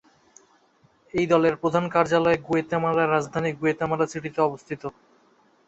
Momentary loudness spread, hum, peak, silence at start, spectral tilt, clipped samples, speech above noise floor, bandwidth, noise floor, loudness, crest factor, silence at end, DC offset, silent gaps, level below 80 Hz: 10 LU; none; -4 dBFS; 1.15 s; -6.5 dB/octave; under 0.1%; 38 dB; 8 kHz; -61 dBFS; -24 LUFS; 20 dB; 0.75 s; under 0.1%; none; -58 dBFS